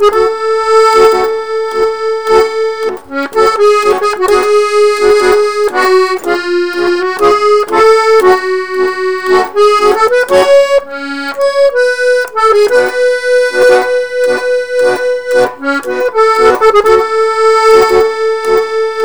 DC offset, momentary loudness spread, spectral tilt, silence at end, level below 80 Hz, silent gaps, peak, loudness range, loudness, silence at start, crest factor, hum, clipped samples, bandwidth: 2%; 7 LU; -3 dB/octave; 0 s; -44 dBFS; none; 0 dBFS; 2 LU; -9 LUFS; 0 s; 10 dB; none; 0.6%; over 20 kHz